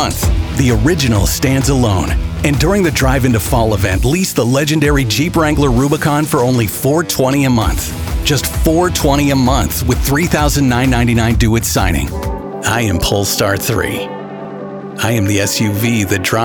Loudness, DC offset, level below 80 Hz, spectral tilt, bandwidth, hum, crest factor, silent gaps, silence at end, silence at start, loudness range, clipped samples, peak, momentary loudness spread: -13 LUFS; under 0.1%; -22 dBFS; -5 dB/octave; over 20 kHz; none; 12 dB; none; 0 s; 0 s; 3 LU; under 0.1%; 0 dBFS; 6 LU